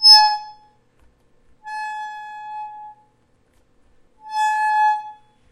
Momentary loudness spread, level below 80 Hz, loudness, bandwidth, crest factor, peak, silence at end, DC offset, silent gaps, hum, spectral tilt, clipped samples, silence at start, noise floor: 23 LU; -64 dBFS; -17 LUFS; 15.5 kHz; 20 dB; 0 dBFS; 0.4 s; under 0.1%; none; none; 4 dB/octave; under 0.1%; 0 s; -61 dBFS